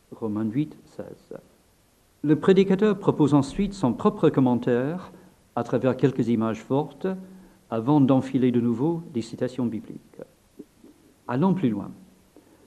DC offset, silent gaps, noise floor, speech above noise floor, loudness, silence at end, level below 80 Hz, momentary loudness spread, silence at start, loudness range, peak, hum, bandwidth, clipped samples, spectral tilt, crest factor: under 0.1%; none; -61 dBFS; 38 dB; -24 LUFS; 0.7 s; -56 dBFS; 21 LU; 0.1 s; 6 LU; -4 dBFS; none; 12.5 kHz; under 0.1%; -8 dB/octave; 20 dB